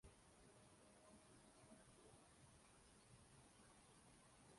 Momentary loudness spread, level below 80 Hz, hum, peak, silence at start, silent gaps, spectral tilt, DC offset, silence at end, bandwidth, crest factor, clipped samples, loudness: 2 LU; -80 dBFS; none; -54 dBFS; 0 s; none; -3.5 dB/octave; under 0.1%; 0 s; 11.5 kHz; 16 dB; under 0.1%; -69 LUFS